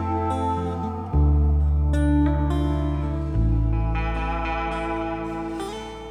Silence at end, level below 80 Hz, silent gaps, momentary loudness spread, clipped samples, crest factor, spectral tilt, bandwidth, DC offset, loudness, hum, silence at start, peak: 0 s; -26 dBFS; none; 9 LU; under 0.1%; 12 dB; -8 dB/octave; 9.6 kHz; under 0.1%; -24 LUFS; none; 0 s; -10 dBFS